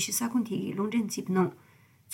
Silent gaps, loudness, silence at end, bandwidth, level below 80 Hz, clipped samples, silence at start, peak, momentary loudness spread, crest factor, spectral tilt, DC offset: none; -30 LUFS; 0 s; 18 kHz; -78 dBFS; under 0.1%; 0 s; -16 dBFS; 4 LU; 16 dB; -4.5 dB/octave; under 0.1%